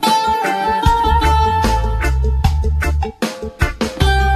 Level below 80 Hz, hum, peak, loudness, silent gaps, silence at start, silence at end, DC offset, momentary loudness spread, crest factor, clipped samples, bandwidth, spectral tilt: -18 dBFS; none; 0 dBFS; -16 LUFS; none; 0 s; 0 s; under 0.1%; 7 LU; 14 dB; under 0.1%; 14 kHz; -5 dB/octave